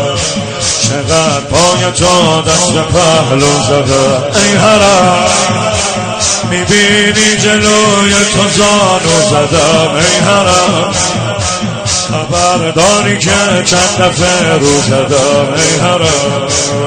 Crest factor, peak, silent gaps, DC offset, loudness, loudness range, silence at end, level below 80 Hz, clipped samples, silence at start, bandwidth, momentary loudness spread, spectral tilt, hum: 8 dB; 0 dBFS; none; under 0.1%; -8 LUFS; 2 LU; 0 s; -34 dBFS; 0.2%; 0 s; 16 kHz; 5 LU; -3 dB/octave; none